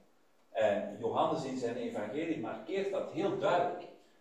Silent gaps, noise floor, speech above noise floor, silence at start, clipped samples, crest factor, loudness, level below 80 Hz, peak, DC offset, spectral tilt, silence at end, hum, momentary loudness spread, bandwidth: none; -70 dBFS; 36 dB; 0.5 s; under 0.1%; 16 dB; -35 LUFS; -76 dBFS; -18 dBFS; under 0.1%; -6 dB/octave; 0.25 s; none; 7 LU; 11 kHz